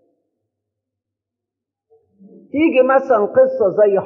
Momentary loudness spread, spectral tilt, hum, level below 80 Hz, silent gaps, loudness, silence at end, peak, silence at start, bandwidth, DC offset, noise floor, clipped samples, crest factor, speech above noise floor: 4 LU; -4.5 dB/octave; none; -66 dBFS; none; -15 LUFS; 0 s; -4 dBFS; 2.55 s; 3.1 kHz; under 0.1%; -83 dBFS; under 0.1%; 14 dB; 69 dB